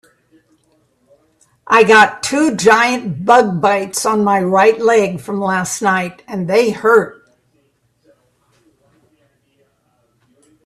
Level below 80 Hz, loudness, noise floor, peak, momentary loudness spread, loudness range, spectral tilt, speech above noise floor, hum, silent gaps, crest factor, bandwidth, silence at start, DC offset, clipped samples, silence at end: -58 dBFS; -13 LUFS; -61 dBFS; 0 dBFS; 10 LU; 7 LU; -4 dB/octave; 48 dB; none; none; 16 dB; 13.5 kHz; 1.7 s; under 0.1%; under 0.1%; 3.5 s